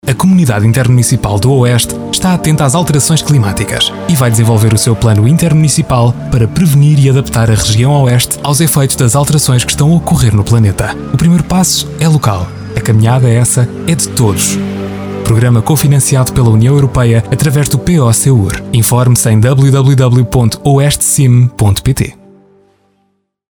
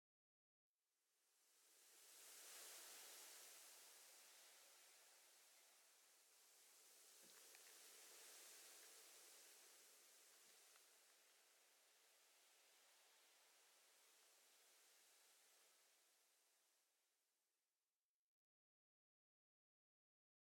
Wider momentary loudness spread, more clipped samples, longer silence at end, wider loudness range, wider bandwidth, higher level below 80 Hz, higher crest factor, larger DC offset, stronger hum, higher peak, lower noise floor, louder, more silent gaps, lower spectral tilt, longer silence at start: second, 5 LU vs 10 LU; neither; second, 1.4 s vs 2.95 s; second, 2 LU vs 6 LU; first, over 20 kHz vs 18 kHz; first, -30 dBFS vs under -90 dBFS; second, 8 dB vs 24 dB; neither; neither; first, 0 dBFS vs -48 dBFS; second, -60 dBFS vs under -90 dBFS; first, -9 LUFS vs -64 LUFS; neither; first, -5.5 dB/octave vs 2.5 dB/octave; second, 0.05 s vs 0.9 s